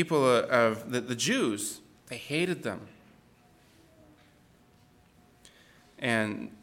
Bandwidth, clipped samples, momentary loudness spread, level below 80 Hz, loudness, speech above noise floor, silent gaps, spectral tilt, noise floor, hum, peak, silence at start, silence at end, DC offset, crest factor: 17 kHz; under 0.1%; 17 LU; -70 dBFS; -28 LUFS; 33 dB; none; -4 dB/octave; -61 dBFS; none; -10 dBFS; 0 s; 0.05 s; under 0.1%; 22 dB